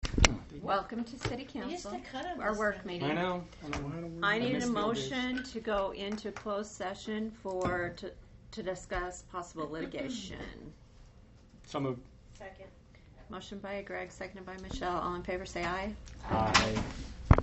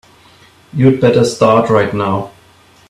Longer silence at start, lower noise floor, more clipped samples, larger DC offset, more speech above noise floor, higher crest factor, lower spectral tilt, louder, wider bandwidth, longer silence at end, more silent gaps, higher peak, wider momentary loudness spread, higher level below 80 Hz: second, 0 s vs 0.75 s; first, -57 dBFS vs -46 dBFS; neither; neither; second, 21 dB vs 35 dB; first, 34 dB vs 14 dB; second, -4.5 dB/octave vs -6.5 dB/octave; second, -35 LUFS vs -12 LUFS; second, 8.2 kHz vs 13 kHz; second, 0 s vs 0.6 s; neither; about the same, -2 dBFS vs 0 dBFS; first, 16 LU vs 12 LU; first, -44 dBFS vs -50 dBFS